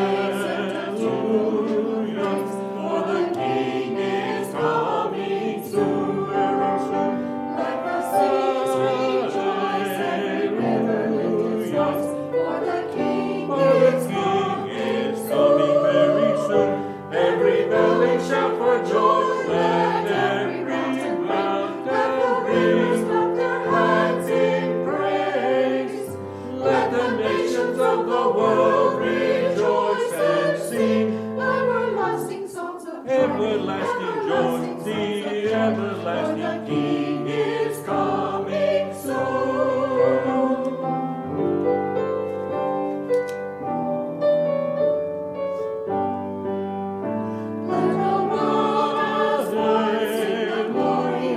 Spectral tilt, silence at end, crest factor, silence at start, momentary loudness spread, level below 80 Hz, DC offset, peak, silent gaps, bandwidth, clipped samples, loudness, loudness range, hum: -6 dB/octave; 0 s; 16 dB; 0 s; 8 LU; -68 dBFS; under 0.1%; -4 dBFS; none; 14.5 kHz; under 0.1%; -22 LUFS; 4 LU; none